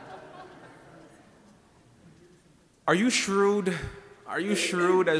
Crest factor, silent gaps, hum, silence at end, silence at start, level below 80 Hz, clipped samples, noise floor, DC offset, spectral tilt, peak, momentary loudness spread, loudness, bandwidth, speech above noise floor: 20 dB; none; none; 0 s; 0 s; -58 dBFS; under 0.1%; -60 dBFS; under 0.1%; -4 dB/octave; -8 dBFS; 23 LU; -26 LUFS; 11 kHz; 35 dB